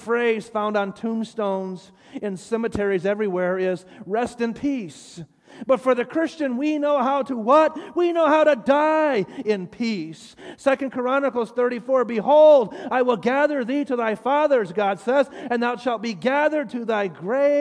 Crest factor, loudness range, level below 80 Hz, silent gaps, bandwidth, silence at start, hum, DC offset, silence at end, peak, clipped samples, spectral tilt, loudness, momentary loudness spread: 16 dB; 6 LU; -62 dBFS; none; 10.5 kHz; 0 s; none; under 0.1%; 0 s; -6 dBFS; under 0.1%; -6 dB/octave; -21 LUFS; 11 LU